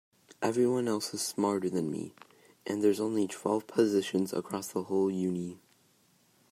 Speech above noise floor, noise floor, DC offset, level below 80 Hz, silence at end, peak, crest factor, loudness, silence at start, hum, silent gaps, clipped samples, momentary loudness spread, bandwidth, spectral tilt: 37 dB; -67 dBFS; under 0.1%; -78 dBFS; 0.95 s; -12 dBFS; 20 dB; -31 LUFS; 0.4 s; none; none; under 0.1%; 9 LU; 16 kHz; -5 dB/octave